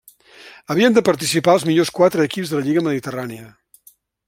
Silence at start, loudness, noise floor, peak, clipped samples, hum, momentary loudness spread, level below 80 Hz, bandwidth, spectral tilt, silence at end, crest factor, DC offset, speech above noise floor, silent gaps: 0.45 s; -17 LUFS; -53 dBFS; -2 dBFS; under 0.1%; none; 13 LU; -60 dBFS; 16.5 kHz; -5 dB/octave; 0.8 s; 16 dB; under 0.1%; 36 dB; none